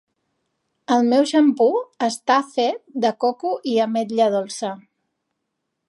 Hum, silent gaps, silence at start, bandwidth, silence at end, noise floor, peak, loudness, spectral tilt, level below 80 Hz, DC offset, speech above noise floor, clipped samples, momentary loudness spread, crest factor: none; none; 0.9 s; 11.5 kHz; 1.1 s; -77 dBFS; -4 dBFS; -20 LUFS; -4.5 dB/octave; -78 dBFS; under 0.1%; 58 dB; under 0.1%; 11 LU; 16 dB